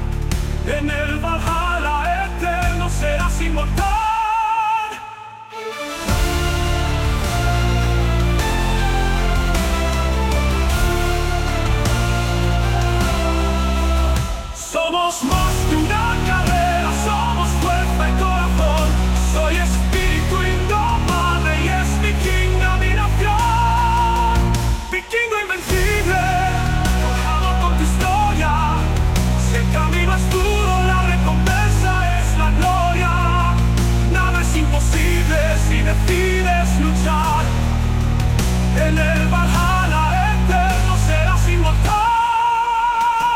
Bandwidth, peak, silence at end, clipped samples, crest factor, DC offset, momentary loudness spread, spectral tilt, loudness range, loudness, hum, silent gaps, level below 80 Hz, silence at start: 16.5 kHz; -6 dBFS; 0 s; under 0.1%; 12 dB; under 0.1%; 4 LU; -5 dB/octave; 3 LU; -18 LUFS; none; none; -20 dBFS; 0 s